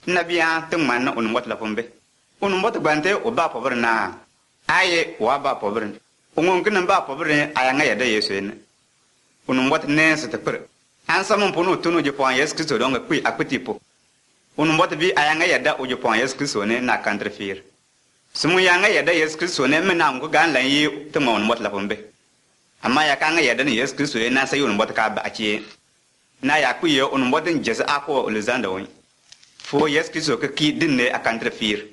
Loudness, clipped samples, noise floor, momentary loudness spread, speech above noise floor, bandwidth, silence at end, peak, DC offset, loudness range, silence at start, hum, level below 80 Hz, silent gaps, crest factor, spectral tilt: -20 LUFS; under 0.1%; -62 dBFS; 11 LU; 42 dB; 11.5 kHz; 0.05 s; -4 dBFS; under 0.1%; 3 LU; 0.05 s; none; -60 dBFS; none; 18 dB; -3.5 dB/octave